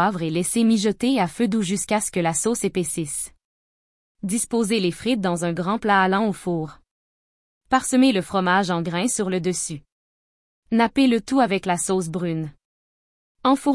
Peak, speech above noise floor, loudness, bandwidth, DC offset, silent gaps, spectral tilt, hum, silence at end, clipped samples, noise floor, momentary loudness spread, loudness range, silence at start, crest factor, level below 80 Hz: -6 dBFS; over 69 dB; -22 LUFS; 12 kHz; under 0.1%; 3.45-4.15 s, 6.91-7.61 s, 9.92-10.62 s, 12.65-13.35 s; -4.5 dB/octave; none; 0 s; under 0.1%; under -90 dBFS; 9 LU; 3 LU; 0 s; 16 dB; -56 dBFS